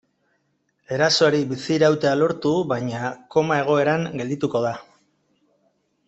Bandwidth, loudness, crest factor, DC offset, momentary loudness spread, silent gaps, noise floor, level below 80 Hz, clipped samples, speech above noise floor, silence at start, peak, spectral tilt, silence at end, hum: 8.2 kHz; -21 LUFS; 18 dB; under 0.1%; 10 LU; none; -70 dBFS; -64 dBFS; under 0.1%; 49 dB; 0.9 s; -4 dBFS; -5 dB/octave; 1.25 s; none